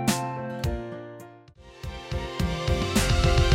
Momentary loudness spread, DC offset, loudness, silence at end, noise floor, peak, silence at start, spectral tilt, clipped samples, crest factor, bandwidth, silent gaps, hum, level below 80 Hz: 19 LU; under 0.1%; -27 LUFS; 0 s; -49 dBFS; -10 dBFS; 0 s; -5 dB/octave; under 0.1%; 16 dB; 16.5 kHz; none; none; -32 dBFS